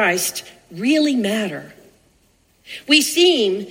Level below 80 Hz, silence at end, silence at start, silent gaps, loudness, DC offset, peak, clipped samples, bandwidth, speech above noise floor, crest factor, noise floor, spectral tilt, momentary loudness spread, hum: -64 dBFS; 0 s; 0 s; none; -17 LUFS; under 0.1%; 0 dBFS; under 0.1%; 16.5 kHz; 40 dB; 20 dB; -59 dBFS; -2.5 dB/octave; 20 LU; none